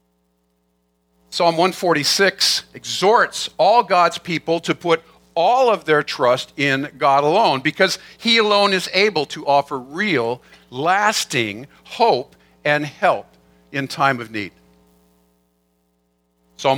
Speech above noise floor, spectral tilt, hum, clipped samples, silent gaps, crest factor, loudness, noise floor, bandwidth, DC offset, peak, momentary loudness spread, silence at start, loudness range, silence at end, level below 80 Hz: 48 dB; -3.5 dB/octave; none; under 0.1%; none; 18 dB; -18 LUFS; -66 dBFS; 18 kHz; under 0.1%; 0 dBFS; 11 LU; 1.3 s; 6 LU; 0 s; -64 dBFS